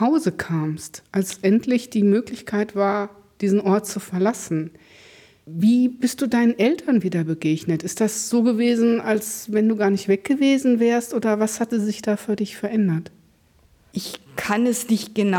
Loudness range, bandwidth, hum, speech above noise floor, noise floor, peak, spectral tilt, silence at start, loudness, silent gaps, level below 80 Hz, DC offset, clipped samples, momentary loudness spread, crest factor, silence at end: 5 LU; 18 kHz; none; 37 dB; -57 dBFS; -8 dBFS; -5.5 dB/octave; 0 s; -21 LUFS; none; -62 dBFS; under 0.1%; under 0.1%; 9 LU; 14 dB; 0 s